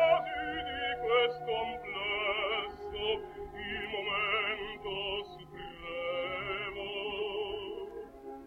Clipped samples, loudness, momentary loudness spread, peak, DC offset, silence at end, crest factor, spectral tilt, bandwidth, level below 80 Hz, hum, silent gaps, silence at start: under 0.1%; -34 LUFS; 13 LU; -16 dBFS; under 0.1%; 0 s; 20 dB; -5 dB/octave; 15.5 kHz; -58 dBFS; none; none; 0 s